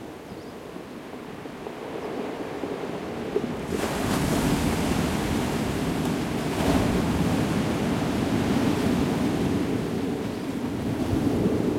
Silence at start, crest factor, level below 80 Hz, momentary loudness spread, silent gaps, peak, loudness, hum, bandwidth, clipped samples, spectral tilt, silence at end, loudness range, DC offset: 0 s; 16 dB; -42 dBFS; 14 LU; none; -10 dBFS; -26 LUFS; none; 16.5 kHz; under 0.1%; -6 dB/octave; 0 s; 7 LU; under 0.1%